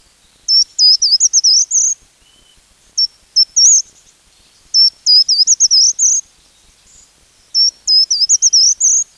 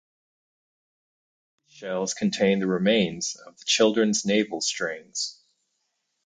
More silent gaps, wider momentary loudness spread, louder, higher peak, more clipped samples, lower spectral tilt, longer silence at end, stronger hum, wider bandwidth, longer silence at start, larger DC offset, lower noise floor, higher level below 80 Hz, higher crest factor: neither; about the same, 9 LU vs 11 LU; first, -9 LUFS vs -24 LUFS; first, -2 dBFS vs -8 dBFS; neither; second, 5.5 dB/octave vs -3.5 dB/octave; second, 0.15 s vs 0.95 s; neither; first, 12.5 kHz vs 9.6 kHz; second, 0.5 s vs 1.75 s; neither; second, -50 dBFS vs -76 dBFS; first, -58 dBFS vs -68 dBFS; second, 12 dB vs 20 dB